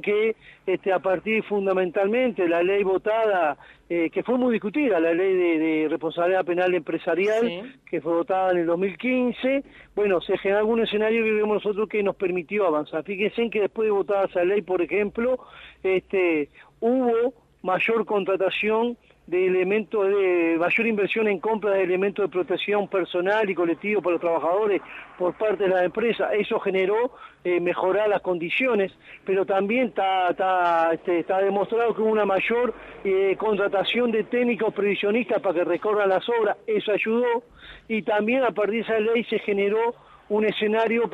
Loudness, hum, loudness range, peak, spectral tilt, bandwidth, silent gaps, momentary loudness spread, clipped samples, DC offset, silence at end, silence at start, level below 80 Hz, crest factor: -23 LUFS; none; 2 LU; -10 dBFS; -7 dB/octave; 7.2 kHz; none; 5 LU; under 0.1%; under 0.1%; 0 s; 0.05 s; -62 dBFS; 14 dB